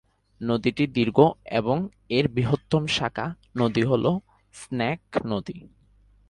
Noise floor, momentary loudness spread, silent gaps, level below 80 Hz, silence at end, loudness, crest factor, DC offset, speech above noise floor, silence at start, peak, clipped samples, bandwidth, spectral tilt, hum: -58 dBFS; 12 LU; none; -54 dBFS; 0.6 s; -25 LUFS; 22 dB; under 0.1%; 34 dB; 0.4 s; -2 dBFS; under 0.1%; 11.5 kHz; -6.5 dB/octave; none